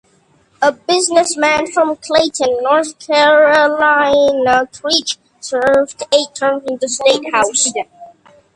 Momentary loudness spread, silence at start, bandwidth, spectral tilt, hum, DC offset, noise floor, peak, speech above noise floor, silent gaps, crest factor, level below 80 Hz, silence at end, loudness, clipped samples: 7 LU; 0.6 s; 11.5 kHz; -1.5 dB/octave; none; under 0.1%; -54 dBFS; 0 dBFS; 41 dB; none; 14 dB; -54 dBFS; 0.5 s; -13 LUFS; under 0.1%